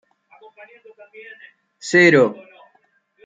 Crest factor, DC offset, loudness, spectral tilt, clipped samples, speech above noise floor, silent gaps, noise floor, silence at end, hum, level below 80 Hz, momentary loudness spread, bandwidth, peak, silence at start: 20 dB; under 0.1%; -14 LUFS; -5 dB/octave; under 0.1%; 43 dB; none; -62 dBFS; 0.95 s; none; -70 dBFS; 28 LU; 9.2 kHz; -2 dBFS; 1.85 s